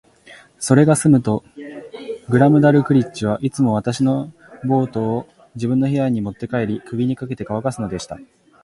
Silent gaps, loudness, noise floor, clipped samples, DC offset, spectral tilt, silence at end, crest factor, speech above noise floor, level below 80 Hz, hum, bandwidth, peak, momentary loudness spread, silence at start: none; -18 LUFS; -46 dBFS; under 0.1%; under 0.1%; -7 dB/octave; 0.4 s; 18 dB; 28 dB; -52 dBFS; none; 11.5 kHz; 0 dBFS; 18 LU; 0.3 s